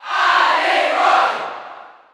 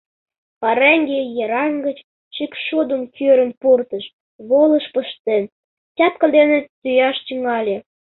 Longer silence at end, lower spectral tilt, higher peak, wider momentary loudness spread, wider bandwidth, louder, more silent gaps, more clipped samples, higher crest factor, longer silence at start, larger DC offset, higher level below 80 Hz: about the same, 0.25 s vs 0.3 s; second, -0.5 dB/octave vs -9 dB/octave; about the same, -2 dBFS vs -2 dBFS; first, 17 LU vs 14 LU; first, 13.5 kHz vs 4.2 kHz; about the same, -15 LUFS vs -17 LUFS; second, none vs 2.04-2.31 s, 3.57-3.61 s, 4.13-4.39 s, 5.20-5.25 s, 5.52-5.95 s, 6.69-6.82 s; neither; about the same, 14 dB vs 16 dB; second, 0 s vs 0.6 s; neither; about the same, -68 dBFS vs -66 dBFS